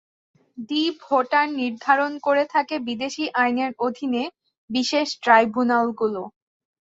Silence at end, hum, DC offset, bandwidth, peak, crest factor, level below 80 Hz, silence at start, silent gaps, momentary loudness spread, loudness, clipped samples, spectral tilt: 0.55 s; none; under 0.1%; 8 kHz; -4 dBFS; 20 dB; -70 dBFS; 0.55 s; 4.58-4.68 s; 10 LU; -22 LUFS; under 0.1%; -3.5 dB/octave